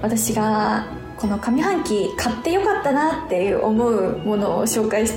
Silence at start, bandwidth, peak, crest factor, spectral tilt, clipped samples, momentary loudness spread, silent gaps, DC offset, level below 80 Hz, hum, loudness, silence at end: 0 s; 19.5 kHz; -8 dBFS; 12 dB; -4.5 dB/octave; under 0.1%; 4 LU; none; under 0.1%; -44 dBFS; none; -20 LUFS; 0 s